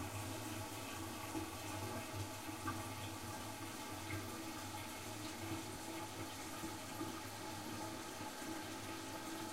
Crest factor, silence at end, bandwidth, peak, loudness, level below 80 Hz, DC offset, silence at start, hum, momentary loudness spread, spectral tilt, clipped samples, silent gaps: 18 dB; 0 s; 16 kHz; -30 dBFS; -46 LUFS; -68 dBFS; under 0.1%; 0 s; none; 2 LU; -3.5 dB/octave; under 0.1%; none